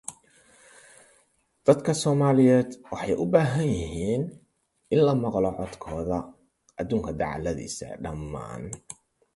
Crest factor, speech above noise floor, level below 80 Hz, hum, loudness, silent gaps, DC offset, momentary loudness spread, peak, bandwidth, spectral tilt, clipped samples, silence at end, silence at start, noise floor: 22 dB; 42 dB; -48 dBFS; none; -26 LUFS; none; under 0.1%; 17 LU; -4 dBFS; 11.5 kHz; -6.5 dB/octave; under 0.1%; 0.4 s; 0.1 s; -67 dBFS